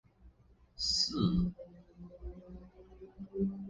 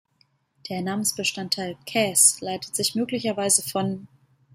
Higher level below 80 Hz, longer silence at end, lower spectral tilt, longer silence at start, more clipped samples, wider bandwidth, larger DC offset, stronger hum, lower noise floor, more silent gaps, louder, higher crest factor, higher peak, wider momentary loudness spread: first, -52 dBFS vs -68 dBFS; second, 0 s vs 0.5 s; first, -5 dB/octave vs -2 dB/octave; second, 0.25 s vs 0.65 s; neither; second, 9.8 kHz vs 16 kHz; neither; neither; about the same, -63 dBFS vs -66 dBFS; neither; second, -33 LUFS vs -22 LUFS; about the same, 20 dB vs 22 dB; second, -18 dBFS vs -4 dBFS; first, 24 LU vs 14 LU